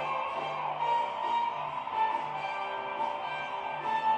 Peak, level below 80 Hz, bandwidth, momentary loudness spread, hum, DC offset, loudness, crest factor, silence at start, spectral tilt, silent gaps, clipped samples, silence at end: -18 dBFS; -76 dBFS; 8.6 kHz; 5 LU; none; under 0.1%; -32 LUFS; 14 dB; 0 s; -4 dB/octave; none; under 0.1%; 0 s